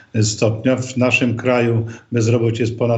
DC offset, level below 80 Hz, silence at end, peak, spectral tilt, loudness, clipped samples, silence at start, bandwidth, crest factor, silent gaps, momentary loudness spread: under 0.1%; -58 dBFS; 0 s; -2 dBFS; -5.5 dB/octave; -18 LUFS; under 0.1%; 0.15 s; 8.2 kHz; 14 dB; none; 4 LU